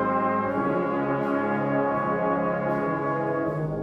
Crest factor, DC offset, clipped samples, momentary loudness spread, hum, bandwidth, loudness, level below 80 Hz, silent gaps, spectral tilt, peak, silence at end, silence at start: 14 dB; under 0.1%; under 0.1%; 2 LU; none; 6.2 kHz; -25 LUFS; -56 dBFS; none; -9.5 dB/octave; -12 dBFS; 0 s; 0 s